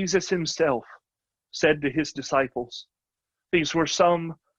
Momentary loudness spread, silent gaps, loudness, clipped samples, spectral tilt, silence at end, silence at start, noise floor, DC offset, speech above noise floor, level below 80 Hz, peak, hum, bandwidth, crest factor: 12 LU; none; -24 LUFS; under 0.1%; -4 dB/octave; 0.25 s; 0 s; -88 dBFS; under 0.1%; 64 dB; -58 dBFS; -6 dBFS; none; 8.8 kHz; 20 dB